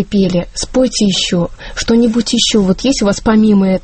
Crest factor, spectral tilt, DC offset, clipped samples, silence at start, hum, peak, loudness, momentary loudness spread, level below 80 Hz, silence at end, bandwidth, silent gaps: 12 dB; -4.5 dB/octave; under 0.1%; under 0.1%; 0 s; none; 0 dBFS; -13 LUFS; 7 LU; -32 dBFS; 0.05 s; 8.8 kHz; none